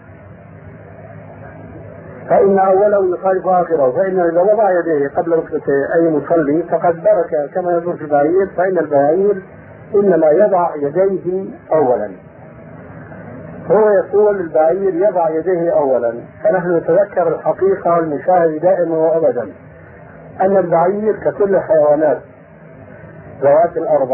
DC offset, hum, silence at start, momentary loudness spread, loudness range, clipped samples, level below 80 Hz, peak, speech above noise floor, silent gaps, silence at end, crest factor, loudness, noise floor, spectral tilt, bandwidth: under 0.1%; none; 0.1 s; 16 LU; 2 LU; under 0.1%; -54 dBFS; -2 dBFS; 25 dB; none; 0 s; 14 dB; -14 LUFS; -39 dBFS; -13.5 dB/octave; 3 kHz